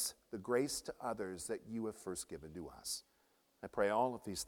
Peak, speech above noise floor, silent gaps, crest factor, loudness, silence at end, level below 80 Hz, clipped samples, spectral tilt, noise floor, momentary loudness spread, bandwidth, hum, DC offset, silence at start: -20 dBFS; 35 dB; none; 20 dB; -41 LUFS; 0 s; -68 dBFS; under 0.1%; -3.5 dB/octave; -75 dBFS; 13 LU; 18.5 kHz; none; under 0.1%; 0 s